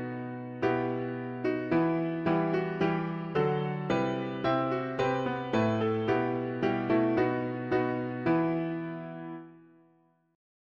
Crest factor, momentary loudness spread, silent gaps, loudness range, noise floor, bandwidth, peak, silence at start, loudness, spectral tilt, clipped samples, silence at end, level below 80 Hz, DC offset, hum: 16 dB; 9 LU; none; 2 LU; -67 dBFS; 7 kHz; -14 dBFS; 0 s; -30 LUFS; -8 dB/octave; under 0.1%; 1.15 s; -62 dBFS; under 0.1%; none